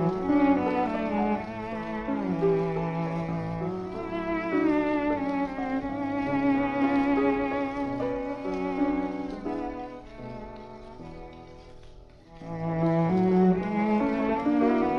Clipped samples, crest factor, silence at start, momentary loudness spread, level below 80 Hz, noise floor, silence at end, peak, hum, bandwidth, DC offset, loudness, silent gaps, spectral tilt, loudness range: under 0.1%; 14 dB; 0 s; 17 LU; -50 dBFS; -48 dBFS; 0 s; -12 dBFS; none; 6.6 kHz; under 0.1%; -27 LUFS; none; -9 dB/octave; 8 LU